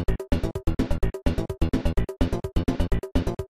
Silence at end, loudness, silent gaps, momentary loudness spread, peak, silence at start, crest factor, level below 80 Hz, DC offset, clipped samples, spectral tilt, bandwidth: 0.05 s; -28 LUFS; none; 2 LU; -8 dBFS; 0 s; 16 dB; -28 dBFS; under 0.1%; under 0.1%; -7.5 dB/octave; 14.5 kHz